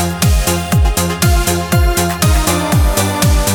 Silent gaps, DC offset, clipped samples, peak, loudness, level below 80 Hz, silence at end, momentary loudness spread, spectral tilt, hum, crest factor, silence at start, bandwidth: none; under 0.1%; under 0.1%; 0 dBFS; -13 LUFS; -16 dBFS; 0 s; 2 LU; -4.5 dB/octave; none; 12 dB; 0 s; over 20 kHz